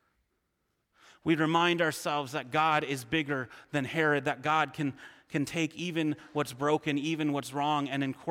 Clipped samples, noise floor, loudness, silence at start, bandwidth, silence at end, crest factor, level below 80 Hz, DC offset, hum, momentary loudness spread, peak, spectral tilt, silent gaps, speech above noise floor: under 0.1%; -79 dBFS; -30 LUFS; 1.25 s; 16.5 kHz; 0 s; 18 dB; -70 dBFS; under 0.1%; none; 8 LU; -12 dBFS; -5 dB/octave; none; 49 dB